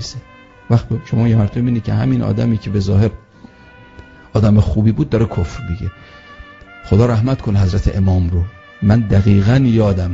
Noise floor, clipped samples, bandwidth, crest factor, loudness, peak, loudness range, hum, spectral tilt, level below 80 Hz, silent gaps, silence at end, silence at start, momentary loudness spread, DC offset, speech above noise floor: -42 dBFS; under 0.1%; 7.6 kHz; 14 dB; -15 LUFS; 0 dBFS; 4 LU; none; -8.5 dB/octave; -30 dBFS; none; 0 s; 0 s; 10 LU; under 0.1%; 28 dB